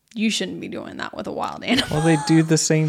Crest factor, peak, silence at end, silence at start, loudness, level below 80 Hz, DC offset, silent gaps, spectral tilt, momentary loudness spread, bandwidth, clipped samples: 16 dB; -4 dBFS; 0 s; 0.15 s; -21 LUFS; -50 dBFS; under 0.1%; none; -4.5 dB/octave; 14 LU; 14.5 kHz; under 0.1%